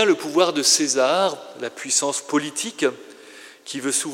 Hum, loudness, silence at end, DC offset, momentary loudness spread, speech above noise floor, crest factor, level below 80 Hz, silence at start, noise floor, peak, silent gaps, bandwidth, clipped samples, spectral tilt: none; -20 LUFS; 0 s; under 0.1%; 16 LU; 23 dB; 18 dB; -88 dBFS; 0 s; -44 dBFS; -4 dBFS; none; 16.5 kHz; under 0.1%; -1.5 dB/octave